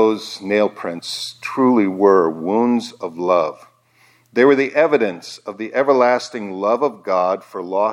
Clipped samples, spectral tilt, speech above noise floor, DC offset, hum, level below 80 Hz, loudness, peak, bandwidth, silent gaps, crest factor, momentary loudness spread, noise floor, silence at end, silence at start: under 0.1%; -5 dB/octave; 38 dB; under 0.1%; none; -74 dBFS; -18 LUFS; -2 dBFS; 13 kHz; none; 16 dB; 11 LU; -55 dBFS; 0 s; 0 s